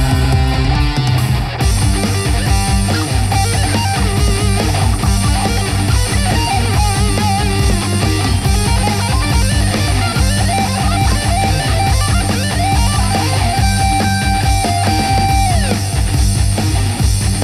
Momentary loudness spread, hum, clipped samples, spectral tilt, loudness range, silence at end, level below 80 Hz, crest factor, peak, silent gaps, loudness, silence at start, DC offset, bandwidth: 2 LU; none; under 0.1%; -4.5 dB/octave; 1 LU; 0 s; -18 dBFS; 10 dB; -2 dBFS; none; -14 LUFS; 0 s; under 0.1%; 15 kHz